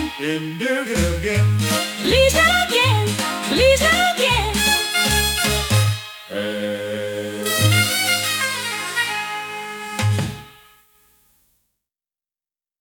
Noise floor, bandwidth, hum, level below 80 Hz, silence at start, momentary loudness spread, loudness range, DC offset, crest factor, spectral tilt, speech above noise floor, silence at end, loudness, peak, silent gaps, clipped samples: under -90 dBFS; 19.5 kHz; none; -36 dBFS; 0 s; 11 LU; 10 LU; under 0.1%; 18 dB; -3.5 dB/octave; over 72 dB; 2.3 s; -18 LUFS; -2 dBFS; none; under 0.1%